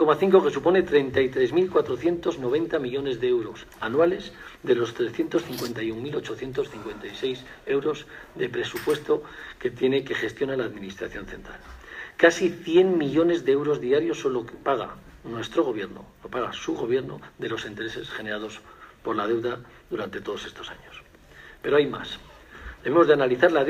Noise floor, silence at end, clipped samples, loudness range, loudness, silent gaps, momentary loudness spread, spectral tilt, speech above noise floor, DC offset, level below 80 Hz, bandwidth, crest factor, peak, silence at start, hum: -49 dBFS; 0 s; under 0.1%; 8 LU; -25 LUFS; none; 17 LU; -5.5 dB/octave; 24 dB; under 0.1%; -54 dBFS; 15.5 kHz; 22 dB; -2 dBFS; 0 s; none